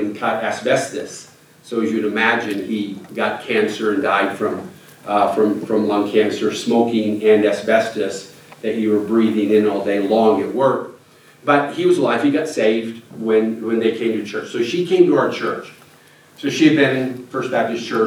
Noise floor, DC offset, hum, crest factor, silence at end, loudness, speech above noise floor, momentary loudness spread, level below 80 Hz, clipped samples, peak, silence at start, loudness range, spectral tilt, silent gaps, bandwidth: -48 dBFS; under 0.1%; none; 18 dB; 0 s; -18 LUFS; 31 dB; 11 LU; -72 dBFS; under 0.1%; 0 dBFS; 0 s; 3 LU; -5.5 dB/octave; none; 15 kHz